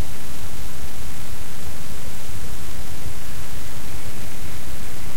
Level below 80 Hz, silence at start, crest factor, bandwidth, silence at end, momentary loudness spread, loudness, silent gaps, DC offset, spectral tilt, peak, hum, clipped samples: -38 dBFS; 0 s; 18 dB; 16.5 kHz; 0 s; 1 LU; -34 LUFS; none; 30%; -4 dB/octave; -8 dBFS; none; under 0.1%